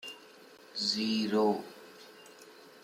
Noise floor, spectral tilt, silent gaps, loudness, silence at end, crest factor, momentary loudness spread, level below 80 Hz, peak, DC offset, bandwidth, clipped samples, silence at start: -55 dBFS; -4 dB/octave; none; -31 LUFS; 0.05 s; 18 dB; 24 LU; -82 dBFS; -16 dBFS; under 0.1%; 16 kHz; under 0.1%; 0.05 s